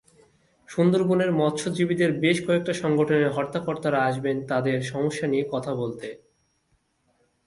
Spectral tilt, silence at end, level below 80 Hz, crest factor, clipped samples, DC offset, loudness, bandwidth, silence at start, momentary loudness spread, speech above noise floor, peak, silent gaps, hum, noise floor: -6 dB/octave; 1.3 s; -64 dBFS; 18 dB; under 0.1%; under 0.1%; -24 LUFS; 11.5 kHz; 0.7 s; 8 LU; 46 dB; -8 dBFS; none; none; -69 dBFS